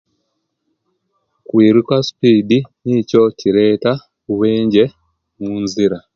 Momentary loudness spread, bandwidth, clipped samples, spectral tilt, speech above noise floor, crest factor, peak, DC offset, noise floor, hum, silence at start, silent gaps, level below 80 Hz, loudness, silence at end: 10 LU; 7.4 kHz; under 0.1%; -7 dB/octave; 57 dB; 16 dB; 0 dBFS; under 0.1%; -70 dBFS; none; 1.55 s; none; -54 dBFS; -15 LUFS; 0.15 s